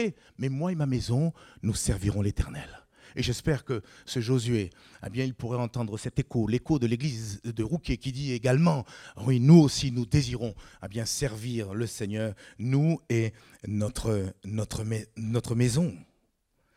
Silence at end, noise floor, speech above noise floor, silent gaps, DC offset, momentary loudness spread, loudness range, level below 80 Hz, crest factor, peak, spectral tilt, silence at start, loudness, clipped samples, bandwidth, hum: 0.75 s; -72 dBFS; 45 dB; none; under 0.1%; 10 LU; 6 LU; -46 dBFS; 20 dB; -8 dBFS; -6 dB/octave; 0 s; -28 LUFS; under 0.1%; 14.5 kHz; none